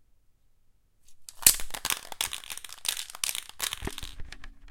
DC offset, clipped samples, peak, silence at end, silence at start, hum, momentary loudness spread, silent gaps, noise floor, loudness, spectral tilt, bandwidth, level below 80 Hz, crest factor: under 0.1%; under 0.1%; 0 dBFS; 0 s; 1.1 s; none; 22 LU; none; -62 dBFS; -28 LUFS; 0.5 dB/octave; 17 kHz; -48 dBFS; 32 dB